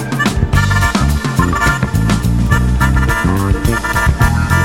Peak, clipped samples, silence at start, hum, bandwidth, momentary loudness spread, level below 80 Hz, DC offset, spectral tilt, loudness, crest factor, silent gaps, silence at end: 0 dBFS; under 0.1%; 0 s; none; 16.5 kHz; 2 LU; -18 dBFS; 0.9%; -5.5 dB/octave; -14 LUFS; 12 dB; none; 0 s